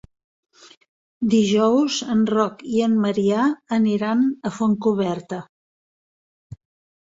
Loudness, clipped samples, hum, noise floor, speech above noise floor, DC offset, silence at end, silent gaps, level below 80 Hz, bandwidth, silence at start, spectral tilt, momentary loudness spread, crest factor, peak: -20 LUFS; under 0.1%; none; under -90 dBFS; over 70 dB; under 0.1%; 0.5 s; 5.49-6.50 s; -60 dBFS; 7.8 kHz; 1.2 s; -6 dB/octave; 7 LU; 16 dB; -4 dBFS